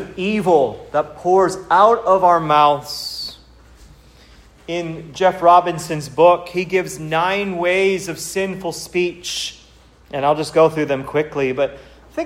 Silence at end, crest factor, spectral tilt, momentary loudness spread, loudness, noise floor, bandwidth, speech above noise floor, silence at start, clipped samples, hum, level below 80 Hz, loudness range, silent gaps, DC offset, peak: 0 s; 18 dB; -4.5 dB/octave; 12 LU; -17 LUFS; -48 dBFS; 16 kHz; 31 dB; 0 s; under 0.1%; none; -50 dBFS; 5 LU; none; under 0.1%; 0 dBFS